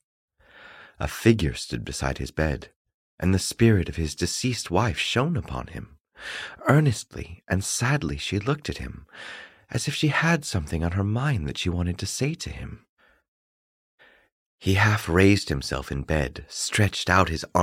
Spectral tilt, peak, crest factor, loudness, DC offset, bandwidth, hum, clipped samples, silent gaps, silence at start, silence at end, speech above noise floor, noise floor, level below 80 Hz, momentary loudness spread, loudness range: -5 dB/octave; -4 dBFS; 22 dB; -25 LUFS; under 0.1%; 16 kHz; none; under 0.1%; 2.76-2.85 s, 2.94-3.18 s, 12.89-12.97 s, 13.28-13.98 s, 14.32-14.58 s; 0.6 s; 0 s; 25 dB; -50 dBFS; -40 dBFS; 15 LU; 4 LU